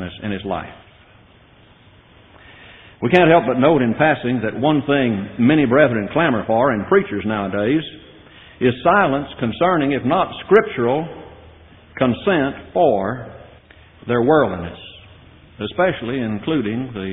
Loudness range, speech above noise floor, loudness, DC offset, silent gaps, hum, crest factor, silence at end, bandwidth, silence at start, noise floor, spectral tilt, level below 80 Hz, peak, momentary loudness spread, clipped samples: 5 LU; 32 dB; -18 LUFS; under 0.1%; none; none; 18 dB; 0 s; 4.2 kHz; 0 s; -49 dBFS; -5 dB/octave; -50 dBFS; 0 dBFS; 13 LU; under 0.1%